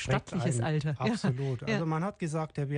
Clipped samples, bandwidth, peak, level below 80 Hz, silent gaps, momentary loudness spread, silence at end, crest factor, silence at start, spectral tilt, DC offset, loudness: under 0.1%; 10 kHz; -14 dBFS; -56 dBFS; none; 4 LU; 0 s; 18 dB; 0 s; -6.5 dB/octave; under 0.1%; -31 LUFS